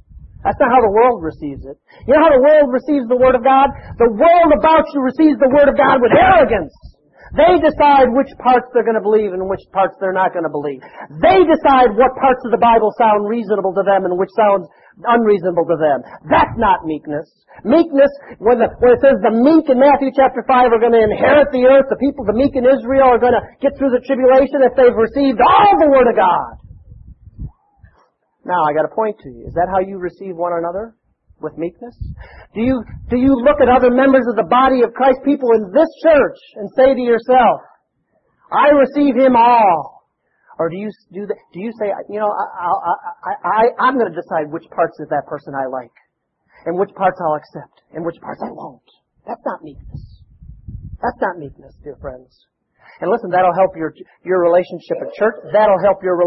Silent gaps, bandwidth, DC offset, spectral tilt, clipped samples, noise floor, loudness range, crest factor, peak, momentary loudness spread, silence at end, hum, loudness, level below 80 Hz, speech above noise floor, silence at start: none; 5.8 kHz; under 0.1%; -9.5 dB/octave; under 0.1%; -65 dBFS; 11 LU; 14 dB; 0 dBFS; 16 LU; 0 s; none; -14 LUFS; -42 dBFS; 51 dB; 0.25 s